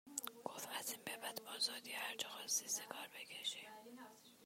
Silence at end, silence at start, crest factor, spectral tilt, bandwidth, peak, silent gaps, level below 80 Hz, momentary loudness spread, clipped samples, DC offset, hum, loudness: 0 s; 0.05 s; 26 dB; 0.5 dB/octave; 16 kHz; -22 dBFS; none; under -90 dBFS; 16 LU; under 0.1%; under 0.1%; none; -44 LUFS